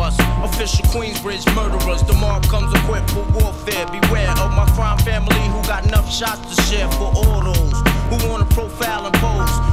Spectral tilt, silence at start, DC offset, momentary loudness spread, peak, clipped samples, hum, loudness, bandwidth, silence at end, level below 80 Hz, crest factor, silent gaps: -5 dB/octave; 0 s; under 0.1%; 4 LU; 0 dBFS; under 0.1%; none; -18 LUFS; 16.5 kHz; 0 s; -18 dBFS; 16 dB; none